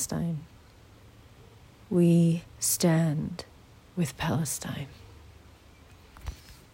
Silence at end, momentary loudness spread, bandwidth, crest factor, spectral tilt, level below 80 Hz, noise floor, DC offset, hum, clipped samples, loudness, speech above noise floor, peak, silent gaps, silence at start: 0.2 s; 21 LU; 16 kHz; 18 dB; -5.5 dB/octave; -54 dBFS; -54 dBFS; under 0.1%; none; under 0.1%; -27 LUFS; 27 dB; -12 dBFS; none; 0 s